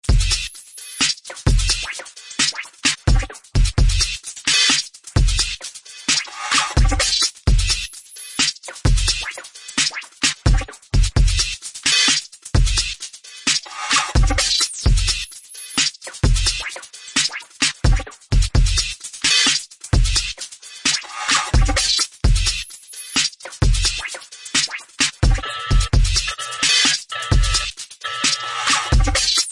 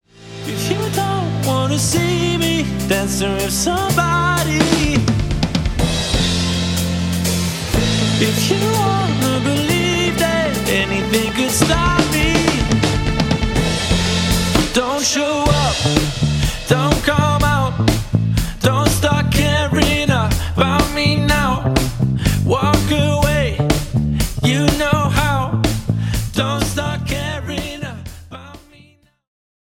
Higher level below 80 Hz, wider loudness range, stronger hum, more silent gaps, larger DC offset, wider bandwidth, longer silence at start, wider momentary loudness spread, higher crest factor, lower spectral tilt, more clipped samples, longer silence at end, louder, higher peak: first, -22 dBFS vs -28 dBFS; about the same, 2 LU vs 2 LU; neither; neither; neither; second, 11.5 kHz vs 17 kHz; second, 0.05 s vs 0.2 s; first, 11 LU vs 5 LU; about the same, 16 dB vs 16 dB; second, -2 dB/octave vs -4.5 dB/octave; neither; second, 0 s vs 1.15 s; about the same, -19 LUFS vs -17 LUFS; about the same, -2 dBFS vs 0 dBFS